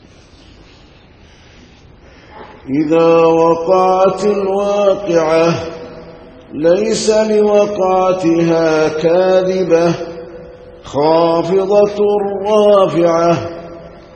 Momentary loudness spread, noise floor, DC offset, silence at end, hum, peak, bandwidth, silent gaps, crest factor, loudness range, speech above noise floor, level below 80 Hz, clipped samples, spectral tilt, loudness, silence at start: 16 LU; -42 dBFS; under 0.1%; 0.15 s; none; 0 dBFS; 8.8 kHz; none; 14 dB; 2 LU; 31 dB; -46 dBFS; under 0.1%; -6 dB/octave; -13 LUFS; 2.35 s